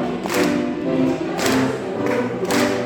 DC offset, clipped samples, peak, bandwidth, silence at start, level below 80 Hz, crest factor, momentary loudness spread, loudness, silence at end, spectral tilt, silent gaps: under 0.1%; under 0.1%; -6 dBFS; 18 kHz; 0 s; -52 dBFS; 14 dB; 3 LU; -20 LUFS; 0 s; -5 dB/octave; none